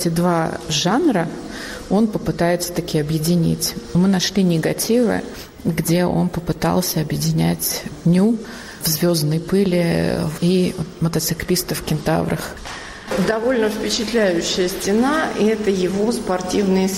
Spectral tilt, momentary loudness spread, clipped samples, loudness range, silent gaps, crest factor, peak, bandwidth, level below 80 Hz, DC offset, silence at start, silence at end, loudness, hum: -5 dB/octave; 7 LU; under 0.1%; 2 LU; none; 12 dB; -6 dBFS; 16 kHz; -42 dBFS; under 0.1%; 0 s; 0 s; -19 LUFS; none